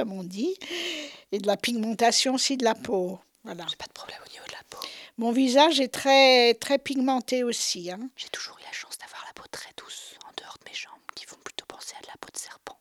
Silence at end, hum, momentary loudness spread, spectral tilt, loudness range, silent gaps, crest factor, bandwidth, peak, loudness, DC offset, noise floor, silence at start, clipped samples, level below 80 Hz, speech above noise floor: 0.1 s; none; 21 LU; -2.5 dB/octave; 17 LU; none; 22 dB; 16 kHz; -6 dBFS; -24 LUFS; under 0.1%; -45 dBFS; 0 s; under 0.1%; -72 dBFS; 20 dB